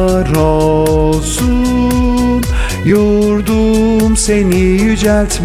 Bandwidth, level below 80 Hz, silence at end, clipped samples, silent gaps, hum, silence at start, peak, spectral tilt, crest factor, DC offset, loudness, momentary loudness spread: over 20 kHz; -20 dBFS; 0 s; under 0.1%; none; none; 0 s; 0 dBFS; -5.5 dB/octave; 10 dB; under 0.1%; -12 LUFS; 3 LU